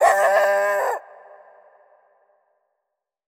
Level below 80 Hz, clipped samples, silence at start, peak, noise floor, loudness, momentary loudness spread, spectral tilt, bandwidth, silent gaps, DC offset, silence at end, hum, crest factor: -70 dBFS; under 0.1%; 0 s; -4 dBFS; -81 dBFS; -19 LUFS; 10 LU; -0.5 dB/octave; 17.5 kHz; none; under 0.1%; 2.25 s; none; 20 dB